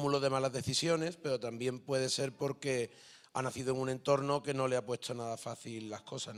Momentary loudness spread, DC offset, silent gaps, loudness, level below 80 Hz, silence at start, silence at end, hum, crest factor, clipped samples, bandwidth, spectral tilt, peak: 11 LU; under 0.1%; none; -35 LUFS; -72 dBFS; 0 s; 0 s; none; 18 dB; under 0.1%; 14.5 kHz; -4.5 dB/octave; -16 dBFS